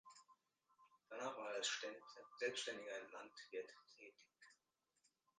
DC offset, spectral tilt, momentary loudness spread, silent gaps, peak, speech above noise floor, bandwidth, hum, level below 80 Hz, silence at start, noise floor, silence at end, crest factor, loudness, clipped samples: under 0.1%; -0.5 dB/octave; 24 LU; none; -30 dBFS; 37 dB; 9.6 kHz; none; under -90 dBFS; 0.05 s; -87 dBFS; 0.85 s; 22 dB; -48 LUFS; under 0.1%